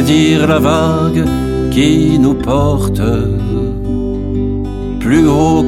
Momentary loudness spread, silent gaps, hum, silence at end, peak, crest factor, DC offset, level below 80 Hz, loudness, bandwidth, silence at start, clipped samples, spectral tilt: 8 LU; none; none; 0 s; 0 dBFS; 12 dB; under 0.1%; -24 dBFS; -13 LUFS; 15 kHz; 0 s; under 0.1%; -6.5 dB/octave